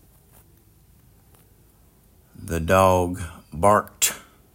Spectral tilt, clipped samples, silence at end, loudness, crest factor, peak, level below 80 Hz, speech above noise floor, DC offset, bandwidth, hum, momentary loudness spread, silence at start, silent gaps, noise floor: -4 dB/octave; under 0.1%; 0.35 s; -21 LUFS; 22 dB; -4 dBFS; -48 dBFS; 36 dB; under 0.1%; 16.5 kHz; none; 18 LU; 2.4 s; none; -56 dBFS